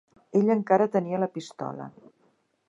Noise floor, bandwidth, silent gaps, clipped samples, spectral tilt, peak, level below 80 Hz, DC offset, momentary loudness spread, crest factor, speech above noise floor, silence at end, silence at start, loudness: -68 dBFS; 10 kHz; none; under 0.1%; -7.5 dB/octave; -6 dBFS; -78 dBFS; under 0.1%; 15 LU; 20 dB; 43 dB; 0.8 s; 0.35 s; -26 LUFS